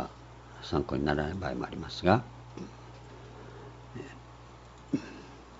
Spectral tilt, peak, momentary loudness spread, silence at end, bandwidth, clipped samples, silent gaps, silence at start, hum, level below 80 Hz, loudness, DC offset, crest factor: -5.5 dB/octave; -6 dBFS; 22 LU; 0 s; 7.6 kHz; under 0.1%; none; 0 s; none; -52 dBFS; -32 LUFS; under 0.1%; 28 dB